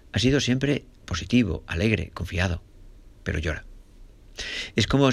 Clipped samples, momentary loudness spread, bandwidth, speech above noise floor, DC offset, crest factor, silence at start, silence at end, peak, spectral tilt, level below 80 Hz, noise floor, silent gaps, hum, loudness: under 0.1%; 14 LU; 12.5 kHz; 24 dB; under 0.1%; 20 dB; 0.15 s; 0 s; -6 dBFS; -5.5 dB/octave; -42 dBFS; -48 dBFS; none; none; -26 LUFS